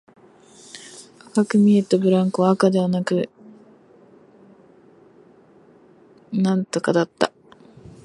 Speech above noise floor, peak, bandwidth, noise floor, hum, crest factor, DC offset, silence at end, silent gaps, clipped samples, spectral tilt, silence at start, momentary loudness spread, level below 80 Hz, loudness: 33 dB; -2 dBFS; 11.5 kHz; -51 dBFS; none; 22 dB; under 0.1%; 0.75 s; none; under 0.1%; -6.5 dB/octave; 0.75 s; 22 LU; -66 dBFS; -20 LUFS